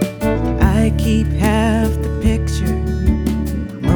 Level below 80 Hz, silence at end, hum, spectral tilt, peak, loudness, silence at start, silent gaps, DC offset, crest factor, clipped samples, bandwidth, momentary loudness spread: -20 dBFS; 0 s; none; -7 dB/octave; 0 dBFS; -17 LUFS; 0 s; none; under 0.1%; 16 dB; under 0.1%; over 20 kHz; 5 LU